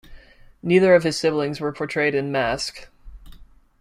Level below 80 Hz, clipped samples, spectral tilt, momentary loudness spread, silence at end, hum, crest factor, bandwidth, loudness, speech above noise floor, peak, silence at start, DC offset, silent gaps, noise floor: -48 dBFS; under 0.1%; -5 dB/octave; 12 LU; 0.4 s; none; 18 dB; 14 kHz; -21 LUFS; 26 dB; -4 dBFS; 0.1 s; under 0.1%; none; -46 dBFS